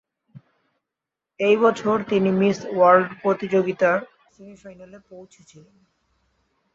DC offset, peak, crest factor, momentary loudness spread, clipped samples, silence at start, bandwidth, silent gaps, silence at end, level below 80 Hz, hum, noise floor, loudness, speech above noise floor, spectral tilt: under 0.1%; -4 dBFS; 20 dB; 8 LU; under 0.1%; 0.35 s; 7.8 kHz; none; 1.5 s; -66 dBFS; none; -86 dBFS; -20 LUFS; 65 dB; -6.5 dB/octave